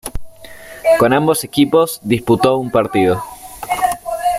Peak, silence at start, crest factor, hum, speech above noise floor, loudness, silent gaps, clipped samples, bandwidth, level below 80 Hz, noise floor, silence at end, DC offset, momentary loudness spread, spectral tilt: -2 dBFS; 0.05 s; 14 dB; none; 22 dB; -15 LUFS; none; under 0.1%; 16 kHz; -40 dBFS; -36 dBFS; 0 s; under 0.1%; 18 LU; -5 dB/octave